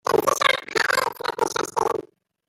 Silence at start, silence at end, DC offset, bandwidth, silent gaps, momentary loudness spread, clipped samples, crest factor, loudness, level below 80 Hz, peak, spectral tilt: 0.05 s; 0.45 s; under 0.1%; 17 kHz; none; 7 LU; under 0.1%; 20 dB; -22 LUFS; -62 dBFS; -4 dBFS; -2 dB/octave